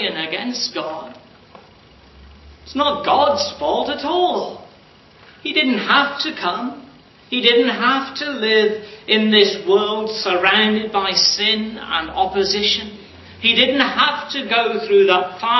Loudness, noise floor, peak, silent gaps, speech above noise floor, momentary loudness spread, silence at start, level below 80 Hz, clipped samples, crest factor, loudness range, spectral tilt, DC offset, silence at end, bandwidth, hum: -17 LUFS; -47 dBFS; 0 dBFS; none; 30 dB; 10 LU; 0 s; -52 dBFS; under 0.1%; 18 dB; 5 LU; -3 dB/octave; under 0.1%; 0 s; 6.2 kHz; none